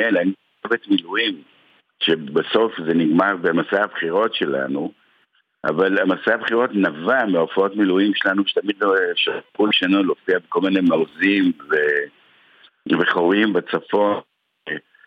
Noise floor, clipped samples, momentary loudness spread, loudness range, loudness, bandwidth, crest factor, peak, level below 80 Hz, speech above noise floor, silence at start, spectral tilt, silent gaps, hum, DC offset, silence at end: -63 dBFS; under 0.1%; 7 LU; 2 LU; -19 LUFS; 5.4 kHz; 16 dB; -4 dBFS; -70 dBFS; 44 dB; 0 s; -7 dB/octave; none; none; under 0.1%; 0.3 s